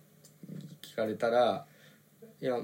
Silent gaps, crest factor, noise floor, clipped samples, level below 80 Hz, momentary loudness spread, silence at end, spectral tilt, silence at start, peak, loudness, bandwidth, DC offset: none; 18 dB; -59 dBFS; under 0.1%; under -90 dBFS; 20 LU; 0 s; -5.5 dB/octave; 0.45 s; -16 dBFS; -32 LUFS; 17 kHz; under 0.1%